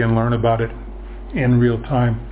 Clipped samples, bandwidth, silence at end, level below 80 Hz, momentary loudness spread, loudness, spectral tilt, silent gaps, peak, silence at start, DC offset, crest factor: under 0.1%; 4 kHz; 0 s; -32 dBFS; 19 LU; -19 LUFS; -12 dB/octave; none; -4 dBFS; 0 s; under 0.1%; 14 dB